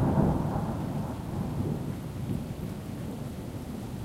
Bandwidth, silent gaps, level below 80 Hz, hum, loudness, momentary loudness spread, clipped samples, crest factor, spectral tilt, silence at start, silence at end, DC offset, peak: 16 kHz; none; -44 dBFS; none; -33 LUFS; 10 LU; under 0.1%; 18 dB; -8 dB/octave; 0 s; 0 s; under 0.1%; -14 dBFS